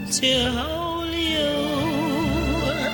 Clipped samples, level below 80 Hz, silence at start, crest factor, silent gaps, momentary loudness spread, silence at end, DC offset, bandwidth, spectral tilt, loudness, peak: under 0.1%; -36 dBFS; 0 s; 14 dB; none; 6 LU; 0 s; under 0.1%; 17 kHz; -4 dB/octave; -22 LUFS; -8 dBFS